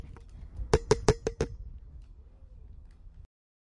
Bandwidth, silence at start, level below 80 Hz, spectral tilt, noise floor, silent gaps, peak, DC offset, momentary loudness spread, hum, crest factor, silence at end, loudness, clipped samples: 11.5 kHz; 0 s; -42 dBFS; -5.5 dB/octave; -51 dBFS; none; -4 dBFS; under 0.1%; 26 LU; none; 28 dB; 0.45 s; -30 LUFS; under 0.1%